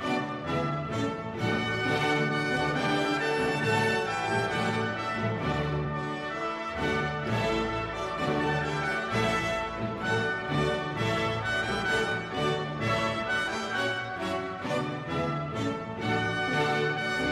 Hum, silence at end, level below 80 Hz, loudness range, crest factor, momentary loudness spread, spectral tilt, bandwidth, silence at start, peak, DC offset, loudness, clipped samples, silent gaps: none; 0 s; -50 dBFS; 3 LU; 14 dB; 5 LU; -5.5 dB/octave; 14.5 kHz; 0 s; -14 dBFS; under 0.1%; -29 LUFS; under 0.1%; none